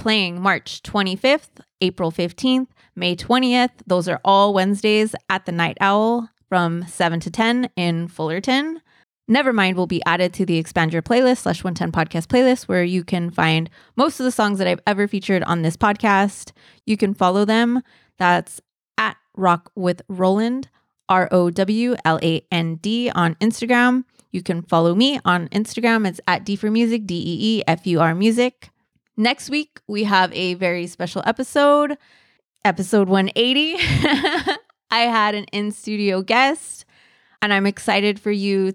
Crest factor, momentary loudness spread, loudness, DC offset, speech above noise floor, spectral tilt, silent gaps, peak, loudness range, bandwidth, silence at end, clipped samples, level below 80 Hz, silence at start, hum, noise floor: 16 dB; 8 LU; -19 LUFS; under 0.1%; 37 dB; -5.5 dB/octave; none; -4 dBFS; 2 LU; 14.5 kHz; 0 s; under 0.1%; -52 dBFS; 0 s; none; -56 dBFS